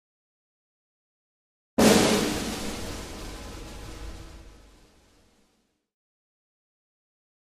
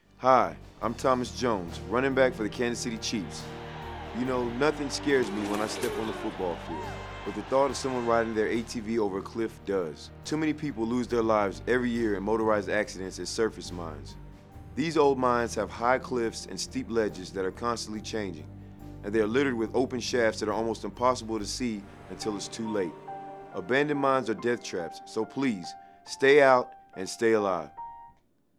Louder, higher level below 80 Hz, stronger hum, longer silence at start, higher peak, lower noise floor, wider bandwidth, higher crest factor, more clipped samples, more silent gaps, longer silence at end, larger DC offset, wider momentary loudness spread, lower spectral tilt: first, -24 LUFS vs -29 LUFS; first, -46 dBFS vs -52 dBFS; neither; first, 1.8 s vs 0.2 s; about the same, -6 dBFS vs -6 dBFS; first, -71 dBFS vs -62 dBFS; about the same, 15.5 kHz vs 15 kHz; about the same, 24 dB vs 22 dB; neither; neither; first, 3 s vs 0.5 s; neither; first, 23 LU vs 14 LU; about the same, -4 dB/octave vs -4.5 dB/octave